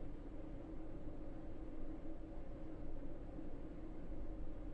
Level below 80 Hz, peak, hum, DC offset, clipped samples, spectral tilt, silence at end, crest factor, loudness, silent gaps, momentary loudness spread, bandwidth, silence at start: -50 dBFS; -34 dBFS; none; under 0.1%; under 0.1%; -9 dB/octave; 0 s; 12 dB; -53 LUFS; none; 1 LU; 3.5 kHz; 0 s